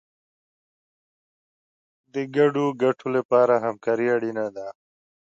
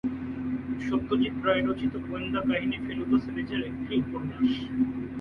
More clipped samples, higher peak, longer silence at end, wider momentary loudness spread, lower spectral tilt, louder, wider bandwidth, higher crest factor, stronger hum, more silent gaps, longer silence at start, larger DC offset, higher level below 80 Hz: neither; first, -8 dBFS vs -12 dBFS; first, 0.5 s vs 0 s; first, 13 LU vs 7 LU; about the same, -7 dB/octave vs -7.5 dB/octave; first, -23 LUFS vs -29 LUFS; first, 7.8 kHz vs 5.6 kHz; about the same, 18 dB vs 16 dB; neither; first, 3.25-3.29 s vs none; first, 2.15 s vs 0.05 s; neither; second, -78 dBFS vs -50 dBFS